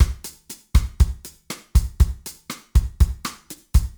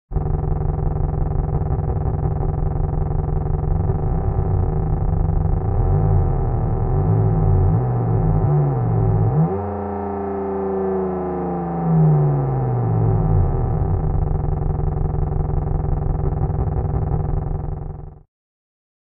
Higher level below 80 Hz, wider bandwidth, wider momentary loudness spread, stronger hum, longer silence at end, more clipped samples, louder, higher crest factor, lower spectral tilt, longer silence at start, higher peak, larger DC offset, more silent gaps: about the same, -22 dBFS vs -24 dBFS; first, over 20 kHz vs 2.7 kHz; first, 16 LU vs 6 LU; neither; second, 0.1 s vs 0.85 s; neither; about the same, -23 LUFS vs -21 LUFS; about the same, 18 dB vs 14 dB; second, -5 dB/octave vs -15 dB/octave; about the same, 0 s vs 0.1 s; about the same, -4 dBFS vs -6 dBFS; neither; neither